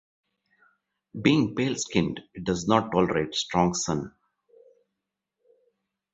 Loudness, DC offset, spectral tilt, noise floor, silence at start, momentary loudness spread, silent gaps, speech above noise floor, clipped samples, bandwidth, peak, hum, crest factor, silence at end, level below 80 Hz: -26 LUFS; under 0.1%; -5 dB/octave; -85 dBFS; 1.15 s; 10 LU; none; 59 dB; under 0.1%; 8.2 kHz; -4 dBFS; none; 24 dB; 2.05 s; -54 dBFS